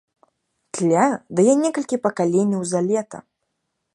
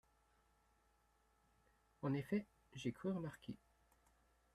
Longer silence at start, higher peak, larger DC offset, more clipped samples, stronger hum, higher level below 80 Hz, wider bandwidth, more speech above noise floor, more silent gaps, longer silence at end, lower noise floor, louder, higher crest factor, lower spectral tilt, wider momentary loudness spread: second, 0.75 s vs 2 s; first, -4 dBFS vs -30 dBFS; neither; neither; neither; first, -70 dBFS vs -76 dBFS; second, 11.5 kHz vs 13.5 kHz; first, 57 dB vs 34 dB; neither; second, 0.75 s vs 1 s; about the same, -76 dBFS vs -78 dBFS; first, -20 LUFS vs -46 LUFS; about the same, 18 dB vs 20 dB; second, -6 dB/octave vs -7.5 dB/octave; second, 10 LU vs 14 LU